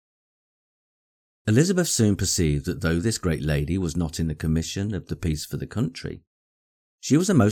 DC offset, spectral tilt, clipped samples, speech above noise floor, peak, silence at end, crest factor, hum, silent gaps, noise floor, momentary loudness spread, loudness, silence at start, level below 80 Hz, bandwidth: under 0.1%; -5.5 dB/octave; under 0.1%; over 67 dB; -6 dBFS; 0 s; 18 dB; none; 6.27-6.98 s; under -90 dBFS; 10 LU; -24 LUFS; 1.45 s; -40 dBFS; 18 kHz